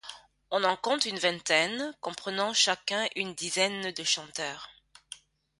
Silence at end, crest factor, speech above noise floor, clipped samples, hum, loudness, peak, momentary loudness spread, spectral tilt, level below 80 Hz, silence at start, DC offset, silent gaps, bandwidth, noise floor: 0.45 s; 24 dB; 21 dB; under 0.1%; none; -28 LUFS; -8 dBFS; 21 LU; -1.5 dB/octave; -74 dBFS; 0.05 s; under 0.1%; none; 11.5 kHz; -51 dBFS